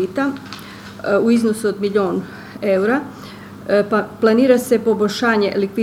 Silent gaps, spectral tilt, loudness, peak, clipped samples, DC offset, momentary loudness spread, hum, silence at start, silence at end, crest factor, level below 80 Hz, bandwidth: none; -5.5 dB/octave; -17 LUFS; 0 dBFS; under 0.1%; under 0.1%; 18 LU; none; 0 s; 0 s; 18 dB; -58 dBFS; 16 kHz